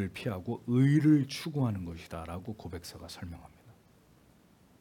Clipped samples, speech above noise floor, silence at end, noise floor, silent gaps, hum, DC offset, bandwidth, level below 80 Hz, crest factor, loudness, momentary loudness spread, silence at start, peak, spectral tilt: under 0.1%; 31 dB; 1.1 s; -62 dBFS; none; none; under 0.1%; 16.5 kHz; -62 dBFS; 18 dB; -30 LUFS; 20 LU; 0 s; -14 dBFS; -7.5 dB/octave